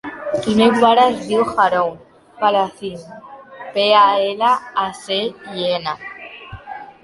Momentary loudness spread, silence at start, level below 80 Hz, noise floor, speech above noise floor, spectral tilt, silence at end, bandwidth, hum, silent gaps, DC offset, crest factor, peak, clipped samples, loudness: 22 LU; 0.05 s; -54 dBFS; -36 dBFS; 19 dB; -4.5 dB/octave; 0.15 s; 11.5 kHz; none; none; under 0.1%; 16 dB; -2 dBFS; under 0.1%; -17 LUFS